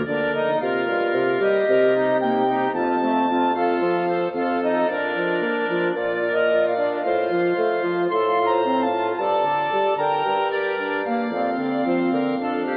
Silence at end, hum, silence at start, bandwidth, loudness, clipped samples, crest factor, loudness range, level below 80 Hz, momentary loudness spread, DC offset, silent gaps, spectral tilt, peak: 0 s; none; 0 s; 5.2 kHz; -21 LUFS; under 0.1%; 14 dB; 2 LU; -66 dBFS; 4 LU; under 0.1%; none; -9 dB/octave; -8 dBFS